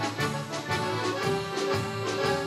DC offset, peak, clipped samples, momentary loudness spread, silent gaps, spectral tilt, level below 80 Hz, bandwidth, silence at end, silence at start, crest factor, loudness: under 0.1%; -14 dBFS; under 0.1%; 3 LU; none; -4.5 dB/octave; -60 dBFS; 15.5 kHz; 0 s; 0 s; 14 dB; -29 LUFS